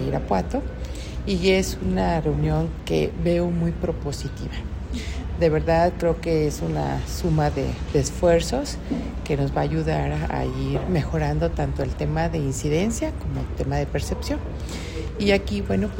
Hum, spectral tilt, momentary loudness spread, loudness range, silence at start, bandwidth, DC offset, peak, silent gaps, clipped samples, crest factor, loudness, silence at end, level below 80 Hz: none; -6 dB/octave; 10 LU; 3 LU; 0 s; 16.5 kHz; under 0.1%; -6 dBFS; none; under 0.1%; 18 dB; -24 LUFS; 0 s; -32 dBFS